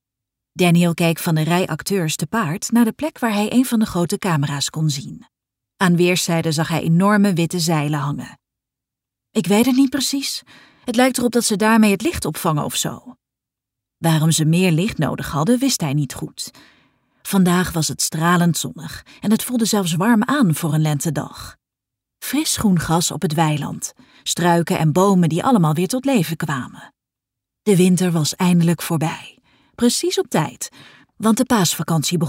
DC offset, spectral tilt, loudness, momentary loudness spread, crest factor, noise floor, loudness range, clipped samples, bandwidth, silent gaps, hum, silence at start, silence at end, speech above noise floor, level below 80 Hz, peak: under 0.1%; -5 dB/octave; -18 LUFS; 12 LU; 16 dB; -85 dBFS; 2 LU; under 0.1%; 16.5 kHz; none; none; 0.55 s; 0 s; 67 dB; -50 dBFS; -2 dBFS